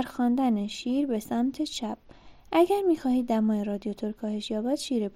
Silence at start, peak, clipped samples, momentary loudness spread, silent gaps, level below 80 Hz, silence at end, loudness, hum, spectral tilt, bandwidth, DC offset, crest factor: 0 s; -10 dBFS; under 0.1%; 9 LU; none; -58 dBFS; 0.05 s; -28 LUFS; none; -5.5 dB/octave; 16 kHz; under 0.1%; 16 dB